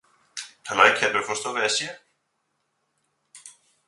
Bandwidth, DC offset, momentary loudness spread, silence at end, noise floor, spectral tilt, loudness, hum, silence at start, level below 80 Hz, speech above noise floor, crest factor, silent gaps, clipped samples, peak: 11.5 kHz; under 0.1%; 20 LU; 0.4 s; -75 dBFS; -1 dB/octave; -21 LUFS; none; 0.35 s; -70 dBFS; 52 dB; 26 dB; none; under 0.1%; 0 dBFS